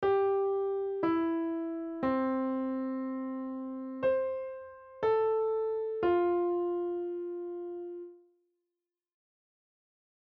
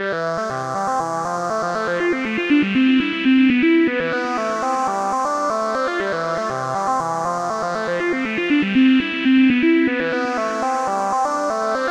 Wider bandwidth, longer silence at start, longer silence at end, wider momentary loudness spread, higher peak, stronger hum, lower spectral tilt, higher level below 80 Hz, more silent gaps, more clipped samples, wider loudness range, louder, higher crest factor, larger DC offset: second, 4.8 kHz vs 10.5 kHz; about the same, 0 s vs 0 s; first, 2.1 s vs 0 s; first, 12 LU vs 7 LU; second, -18 dBFS vs -6 dBFS; neither; about the same, -5 dB/octave vs -5 dB/octave; second, -68 dBFS vs -56 dBFS; neither; neither; first, 7 LU vs 4 LU; second, -32 LUFS vs -19 LUFS; about the same, 14 dB vs 14 dB; neither